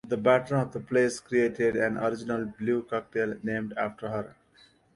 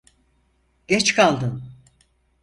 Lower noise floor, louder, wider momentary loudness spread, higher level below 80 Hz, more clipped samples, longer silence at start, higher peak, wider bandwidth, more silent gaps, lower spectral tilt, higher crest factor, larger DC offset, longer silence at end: about the same, -61 dBFS vs -64 dBFS; second, -28 LUFS vs -19 LUFS; second, 9 LU vs 13 LU; second, -62 dBFS vs -56 dBFS; neither; second, 0.05 s vs 0.9 s; second, -10 dBFS vs -2 dBFS; about the same, 11.5 kHz vs 11.5 kHz; neither; first, -6 dB/octave vs -3.5 dB/octave; about the same, 18 dB vs 22 dB; neither; about the same, 0.65 s vs 0.7 s